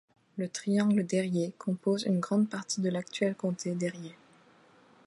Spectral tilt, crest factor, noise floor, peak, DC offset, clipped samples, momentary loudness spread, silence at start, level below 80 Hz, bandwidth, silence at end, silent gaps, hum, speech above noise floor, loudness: -5.5 dB/octave; 16 dB; -60 dBFS; -16 dBFS; under 0.1%; under 0.1%; 10 LU; 0.35 s; -78 dBFS; 11.5 kHz; 0.95 s; none; none; 30 dB; -31 LUFS